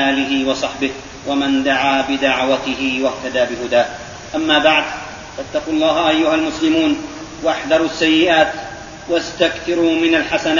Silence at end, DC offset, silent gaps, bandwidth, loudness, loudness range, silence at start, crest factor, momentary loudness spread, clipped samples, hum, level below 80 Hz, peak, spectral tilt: 0 s; under 0.1%; none; 7.4 kHz; -16 LUFS; 2 LU; 0 s; 16 dB; 11 LU; under 0.1%; none; -46 dBFS; 0 dBFS; -1.5 dB/octave